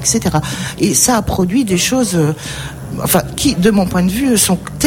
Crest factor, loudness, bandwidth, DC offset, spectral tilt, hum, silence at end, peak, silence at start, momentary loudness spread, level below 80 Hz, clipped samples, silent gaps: 14 dB; -14 LUFS; 17 kHz; under 0.1%; -4 dB/octave; none; 0 s; 0 dBFS; 0 s; 10 LU; -34 dBFS; under 0.1%; none